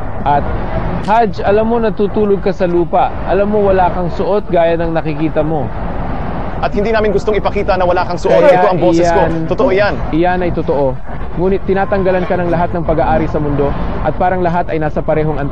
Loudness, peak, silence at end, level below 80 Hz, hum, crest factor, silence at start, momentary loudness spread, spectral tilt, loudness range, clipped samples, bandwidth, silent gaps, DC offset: -14 LUFS; 0 dBFS; 0 s; -24 dBFS; none; 14 dB; 0 s; 7 LU; -7.5 dB/octave; 4 LU; under 0.1%; 8.4 kHz; none; 9%